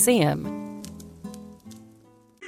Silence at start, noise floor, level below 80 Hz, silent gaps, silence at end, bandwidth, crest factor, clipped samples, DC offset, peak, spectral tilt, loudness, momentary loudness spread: 0 s; -55 dBFS; -58 dBFS; none; 0 s; 16.5 kHz; 20 dB; under 0.1%; under 0.1%; -8 dBFS; -4.5 dB/octave; -25 LUFS; 25 LU